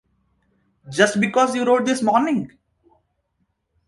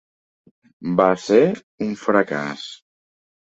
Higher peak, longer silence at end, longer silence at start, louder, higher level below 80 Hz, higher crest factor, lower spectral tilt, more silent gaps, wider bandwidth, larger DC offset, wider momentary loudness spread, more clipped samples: about the same, -2 dBFS vs -2 dBFS; first, 1.4 s vs 0.7 s; about the same, 0.85 s vs 0.8 s; about the same, -19 LUFS vs -20 LUFS; about the same, -64 dBFS vs -62 dBFS; about the same, 20 dB vs 20 dB; second, -4.5 dB/octave vs -6 dB/octave; second, none vs 1.63-1.78 s; first, 11.5 kHz vs 8 kHz; neither; second, 9 LU vs 16 LU; neither